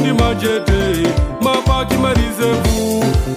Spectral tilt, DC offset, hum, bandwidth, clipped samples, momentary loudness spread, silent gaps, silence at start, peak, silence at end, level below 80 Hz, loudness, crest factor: -5.5 dB/octave; under 0.1%; none; 16 kHz; under 0.1%; 2 LU; none; 0 s; -2 dBFS; 0 s; -22 dBFS; -16 LUFS; 12 dB